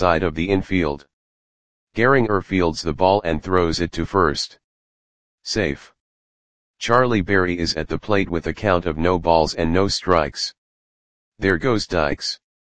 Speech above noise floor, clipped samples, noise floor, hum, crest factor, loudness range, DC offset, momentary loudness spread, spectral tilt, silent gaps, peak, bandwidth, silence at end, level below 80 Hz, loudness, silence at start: over 70 dB; under 0.1%; under -90 dBFS; none; 20 dB; 4 LU; 2%; 9 LU; -5 dB/octave; 1.13-1.87 s, 4.64-5.38 s, 6.00-6.74 s, 10.58-11.32 s; 0 dBFS; 9.8 kHz; 0.25 s; -40 dBFS; -20 LUFS; 0 s